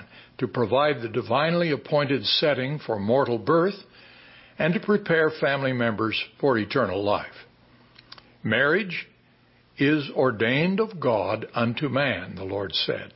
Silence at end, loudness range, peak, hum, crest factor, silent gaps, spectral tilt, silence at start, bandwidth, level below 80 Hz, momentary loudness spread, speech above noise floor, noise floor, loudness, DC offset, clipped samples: 0.1 s; 3 LU; -8 dBFS; none; 16 dB; none; -10 dB/octave; 0 s; 5.8 kHz; -58 dBFS; 7 LU; 35 dB; -59 dBFS; -24 LUFS; under 0.1%; under 0.1%